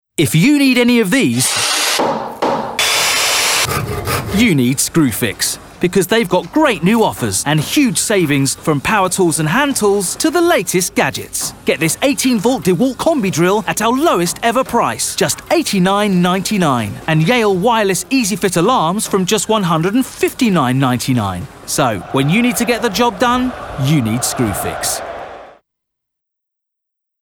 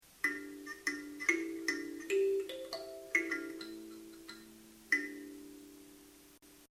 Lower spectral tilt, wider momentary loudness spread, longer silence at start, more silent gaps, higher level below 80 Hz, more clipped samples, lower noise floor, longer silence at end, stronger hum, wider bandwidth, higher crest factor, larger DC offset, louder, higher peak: first, -4 dB/octave vs -2 dB/octave; second, 6 LU vs 22 LU; first, 0.2 s vs 0.05 s; neither; first, -44 dBFS vs -74 dBFS; neither; first, -78 dBFS vs -61 dBFS; first, 1.7 s vs 0.05 s; neither; first, 20 kHz vs 17.5 kHz; second, 12 dB vs 24 dB; neither; first, -14 LUFS vs -37 LUFS; first, -2 dBFS vs -16 dBFS